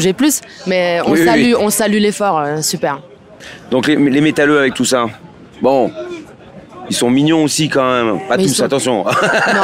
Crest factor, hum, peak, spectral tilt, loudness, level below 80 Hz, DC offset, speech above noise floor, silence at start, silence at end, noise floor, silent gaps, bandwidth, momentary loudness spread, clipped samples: 12 dB; none; -2 dBFS; -4 dB/octave; -13 LUFS; -54 dBFS; under 0.1%; 23 dB; 0 s; 0 s; -37 dBFS; none; 16 kHz; 9 LU; under 0.1%